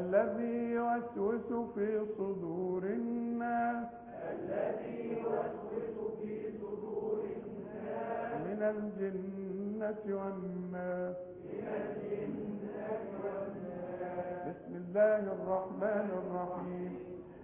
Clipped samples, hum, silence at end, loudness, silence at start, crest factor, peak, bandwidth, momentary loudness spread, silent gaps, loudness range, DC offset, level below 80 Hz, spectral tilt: under 0.1%; none; 0 s; -38 LUFS; 0 s; 20 dB; -18 dBFS; 3.6 kHz; 8 LU; none; 4 LU; under 0.1%; -70 dBFS; -8 dB/octave